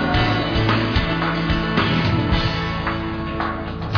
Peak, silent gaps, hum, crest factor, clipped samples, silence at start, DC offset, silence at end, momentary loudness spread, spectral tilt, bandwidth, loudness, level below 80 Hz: -6 dBFS; none; none; 14 dB; under 0.1%; 0 s; under 0.1%; 0 s; 6 LU; -7 dB/octave; 5.4 kHz; -20 LUFS; -30 dBFS